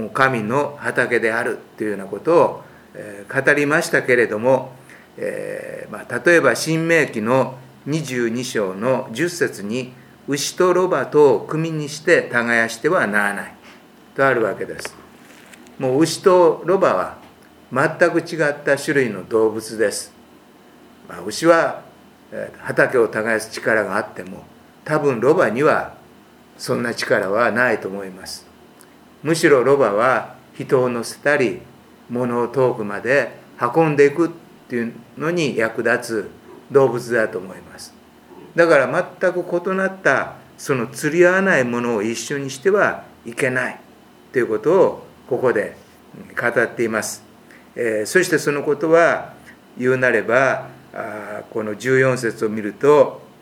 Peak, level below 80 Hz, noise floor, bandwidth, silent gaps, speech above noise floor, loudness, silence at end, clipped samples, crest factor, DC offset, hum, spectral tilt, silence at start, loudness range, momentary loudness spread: 0 dBFS; -64 dBFS; -47 dBFS; 17 kHz; none; 29 dB; -19 LUFS; 0.2 s; under 0.1%; 20 dB; under 0.1%; none; -5 dB/octave; 0 s; 3 LU; 16 LU